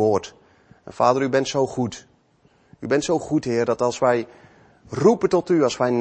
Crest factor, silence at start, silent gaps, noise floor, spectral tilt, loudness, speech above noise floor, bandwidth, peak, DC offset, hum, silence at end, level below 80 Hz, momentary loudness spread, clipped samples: 18 dB; 0 s; none; -59 dBFS; -5.5 dB/octave; -21 LUFS; 39 dB; 8.8 kHz; -4 dBFS; under 0.1%; none; 0 s; -58 dBFS; 13 LU; under 0.1%